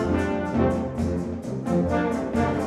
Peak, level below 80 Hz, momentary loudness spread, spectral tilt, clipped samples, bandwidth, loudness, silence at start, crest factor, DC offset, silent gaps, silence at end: -10 dBFS; -40 dBFS; 5 LU; -8 dB/octave; under 0.1%; 12.5 kHz; -25 LUFS; 0 s; 14 dB; under 0.1%; none; 0 s